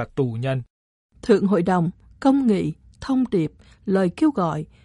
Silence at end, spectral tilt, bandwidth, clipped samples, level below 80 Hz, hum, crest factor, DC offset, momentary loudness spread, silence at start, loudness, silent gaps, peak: 0.2 s; -8 dB/octave; 11 kHz; under 0.1%; -52 dBFS; none; 18 dB; under 0.1%; 11 LU; 0 s; -22 LUFS; 0.70-1.09 s; -4 dBFS